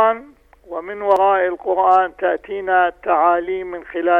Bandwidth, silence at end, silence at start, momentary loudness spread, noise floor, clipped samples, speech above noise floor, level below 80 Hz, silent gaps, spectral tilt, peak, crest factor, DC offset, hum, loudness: 5.6 kHz; 0 s; 0 s; 13 LU; -45 dBFS; under 0.1%; 27 dB; -54 dBFS; none; -6 dB/octave; -2 dBFS; 14 dB; under 0.1%; 50 Hz at -60 dBFS; -18 LUFS